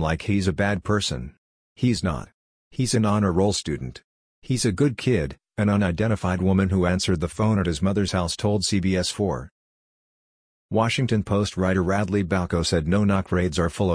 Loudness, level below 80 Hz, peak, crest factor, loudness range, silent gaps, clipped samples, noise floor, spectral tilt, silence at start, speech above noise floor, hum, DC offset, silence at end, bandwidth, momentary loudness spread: -23 LUFS; -42 dBFS; -6 dBFS; 16 dB; 3 LU; 1.38-1.76 s, 2.34-2.71 s, 4.04-4.42 s, 9.51-10.69 s; under 0.1%; under -90 dBFS; -5.5 dB/octave; 0 s; over 68 dB; none; under 0.1%; 0 s; 10.5 kHz; 7 LU